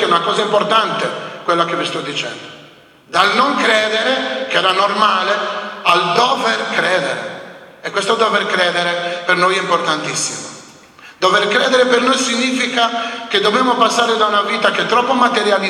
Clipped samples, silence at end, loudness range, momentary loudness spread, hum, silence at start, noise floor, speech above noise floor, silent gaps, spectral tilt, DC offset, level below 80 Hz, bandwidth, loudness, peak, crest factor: under 0.1%; 0 s; 3 LU; 9 LU; none; 0 s; -43 dBFS; 28 dB; none; -2.5 dB/octave; under 0.1%; -64 dBFS; 15 kHz; -15 LUFS; 0 dBFS; 16 dB